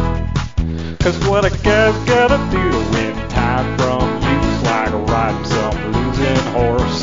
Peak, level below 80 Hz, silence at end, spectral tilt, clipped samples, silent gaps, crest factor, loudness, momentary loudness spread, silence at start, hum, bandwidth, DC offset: -2 dBFS; -26 dBFS; 0 s; -6 dB/octave; under 0.1%; none; 14 dB; -16 LUFS; 6 LU; 0 s; none; 7.6 kHz; 1%